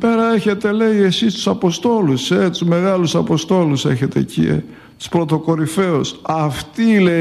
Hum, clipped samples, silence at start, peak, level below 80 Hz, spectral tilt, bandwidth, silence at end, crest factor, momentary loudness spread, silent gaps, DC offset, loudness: none; under 0.1%; 0 s; -2 dBFS; -48 dBFS; -6 dB/octave; 13.5 kHz; 0 s; 14 dB; 5 LU; none; under 0.1%; -16 LUFS